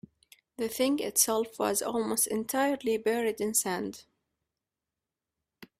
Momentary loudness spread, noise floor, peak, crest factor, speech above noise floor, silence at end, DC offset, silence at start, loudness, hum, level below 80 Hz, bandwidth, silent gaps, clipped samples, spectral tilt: 9 LU; -89 dBFS; -10 dBFS; 22 dB; 60 dB; 0.15 s; under 0.1%; 0.6 s; -29 LUFS; none; -70 dBFS; 16 kHz; none; under 0.1%; -2.5 dB/octave